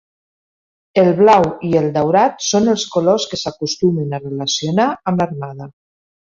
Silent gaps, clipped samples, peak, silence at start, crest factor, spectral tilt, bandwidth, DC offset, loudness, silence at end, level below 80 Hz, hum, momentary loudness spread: none; under 0.1%; 0 dBFS; 0.95 s; 16 dB; -5 dB/octave; 7.8 kHz; under 0.1%; -16 LUFS; 0.6 s; -54 dBFS; none; 11 LU